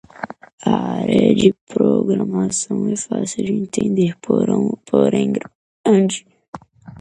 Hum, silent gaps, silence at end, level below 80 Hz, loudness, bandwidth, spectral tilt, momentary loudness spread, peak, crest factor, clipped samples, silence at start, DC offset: none; 0.53-0.58 s, 1.61-1.67 s, 5.55-5.84 s, 6.48-6.53 s; 0 s; -54 dBFS; -18 LUFS; 11 kHz; -6 dB/octave; 15 LU; 0 dBFS; 18 dB; under 0.1%; 0.15 s; under 0.1%